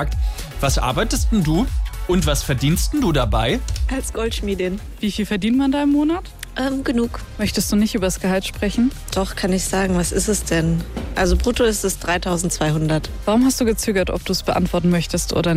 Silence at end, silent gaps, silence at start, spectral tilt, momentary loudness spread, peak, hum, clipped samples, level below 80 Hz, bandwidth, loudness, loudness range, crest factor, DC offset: 0 s; none; 0 s; -5 dB/octave; 6 LU; -6 dBFS; none; under 0.1%; -26 dBFS; 16 kHz; -20 LUFS; 2 LU; 14 dB; under 0.1%